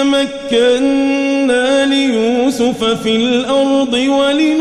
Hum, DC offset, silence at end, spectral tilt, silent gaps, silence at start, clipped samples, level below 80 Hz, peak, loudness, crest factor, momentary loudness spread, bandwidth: none; under 0.1%; 0 s; -3.5 dB/octave; none; 0 s; under 0.1%; -48 dBFS; -2 dBFS; -13 LUFS; 10 dB; 3 LU; 12 kHz